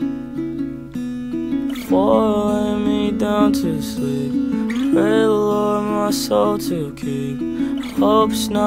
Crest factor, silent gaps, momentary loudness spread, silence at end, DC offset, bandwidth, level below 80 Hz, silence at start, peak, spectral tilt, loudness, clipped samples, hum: 16 dB; none; 10 LU; 0 s; under 0.1%; 16 kHz; -44 dBFS; 0 s; -2 dBFS; -6 dB/octave; -19 LUFS; under 0.1%; none